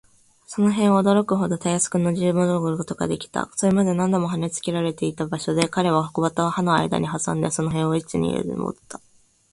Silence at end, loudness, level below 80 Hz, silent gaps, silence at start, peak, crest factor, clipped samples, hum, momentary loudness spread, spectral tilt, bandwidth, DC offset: 0.55 s; -22 LUFS; -54 dBFS; none; 0.5 s; -4 dBFS; 18 dB; under 0.1%; none; 8 LU; -5.5 dB/octave; 11.5 kHz; under 0.1%